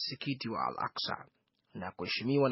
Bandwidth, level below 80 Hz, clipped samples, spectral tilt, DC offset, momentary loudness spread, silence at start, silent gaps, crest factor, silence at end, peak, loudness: 6 kHz; -74 dBFS; under 0.1%; -3.5 dB/octave; under 0.1%; 13 LU; 0 s; none; 20 dB; 0 s; -16 dBFS; -36 LUFS